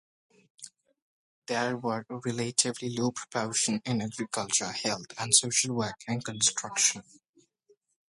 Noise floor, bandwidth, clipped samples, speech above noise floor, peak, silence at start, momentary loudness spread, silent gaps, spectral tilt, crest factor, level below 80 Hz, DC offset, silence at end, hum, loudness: -68 dBFS; 11.5 kHz; under 0.1%; 38 dB; -8 dBFS; 0.6 s; 11 LU; 1.02-1.42 s; -2.5 dB/octave; 24 dB; -70 dBFS; under 0.1%; 1.1 s; none; -28 LUFS